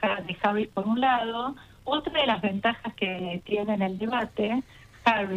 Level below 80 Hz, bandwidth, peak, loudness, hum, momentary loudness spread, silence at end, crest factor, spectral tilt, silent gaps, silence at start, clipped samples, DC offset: -58 dBFS; 10 kHz; -8 dBFS; -27 LUFS; none; 7 LU; 0 s; 20 dB; -6.5 dB/octave; none; 0 s; under 0.1%; under 0.1%